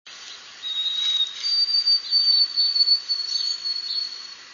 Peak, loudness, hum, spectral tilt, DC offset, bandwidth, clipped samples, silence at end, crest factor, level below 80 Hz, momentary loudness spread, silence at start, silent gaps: -10 dBFS; -19 LUFS; none; 3.5 dB/octave; under 0.1%; 7.4 kHz; under 0.1%; 0 s; 14 dB; -80 dBFS; 16 LU; 0.05 s; none